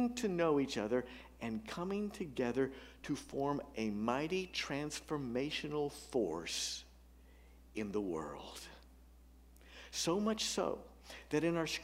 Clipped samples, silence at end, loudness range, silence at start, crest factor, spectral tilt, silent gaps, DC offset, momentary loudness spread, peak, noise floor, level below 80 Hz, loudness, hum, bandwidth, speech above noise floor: under 0.1%; 0 s; 5 LU; 0 s; 20 dB; -4 dB/octave; none; under 0.1%; 14 LU; -20 dBFS; -60 dBFS; -62 dBFS; -38 LUFS; 60 Hz at -60 dBFS; 16 kHz; 22 dB